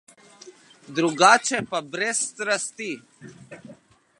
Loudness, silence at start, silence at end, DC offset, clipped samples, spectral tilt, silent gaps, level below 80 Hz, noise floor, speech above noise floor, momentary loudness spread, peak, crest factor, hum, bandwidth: -22 LUFS; 0.45 s; 0.45 s; under 0.1%; under 0.1%; -2 dB/octave; none; -72 dBFS; -51 dBFS; 28 dB; 24 LU; 0 dBFS; 24 dB; none; 11.5 kHz